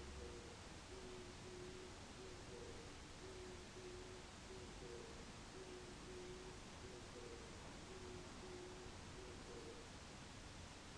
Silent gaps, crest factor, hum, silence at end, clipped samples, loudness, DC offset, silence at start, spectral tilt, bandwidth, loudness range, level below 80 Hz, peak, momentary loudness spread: none; 14 dB; none; 0 s; under 0.1%; -56 LUFS; under 0.1%; 0 s; -4 dB/octave; 11 kHz; 0 LU; -64 dBFS; -42 dBFS; 2 LU